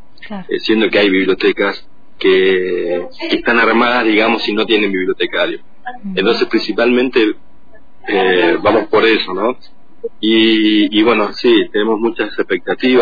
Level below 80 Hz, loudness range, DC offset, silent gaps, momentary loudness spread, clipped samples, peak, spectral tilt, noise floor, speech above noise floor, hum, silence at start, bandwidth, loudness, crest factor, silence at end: -50 dBFS; 2 LU; 3%; none; 11 LU; under 0.1%; -2 dBFS; -6 dB/octave; -48 dBFS; 34 dB; none; 0.2 s; 5 kHz; -13 LUFS; 12 dB; 0 s